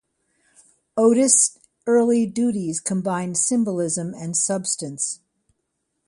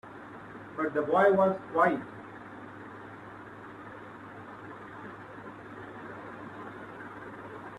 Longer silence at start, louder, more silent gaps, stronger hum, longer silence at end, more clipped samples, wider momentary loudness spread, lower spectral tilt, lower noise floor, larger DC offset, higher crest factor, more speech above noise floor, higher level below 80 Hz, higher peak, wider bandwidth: first, 0.95 s vs 0.05 s; first, -20 LUFS vs -28 LUFS; neither; neither; first, 0.9 s vs 0 s; neither; second, 11 LU vs 20 LU; second, -4 dB/octave vs -7.5 dB/octave; first, -76 dBFS vs -46 dBFS; neither; about the same, 22 dB vs 22 dB; first, 55 dB vs 20 dB; about the same, -68 dBFS vs -70 dBFS; first, 0 dBFS vs -12 dBFS; about the same, 11.5 kHz vs 11 kHz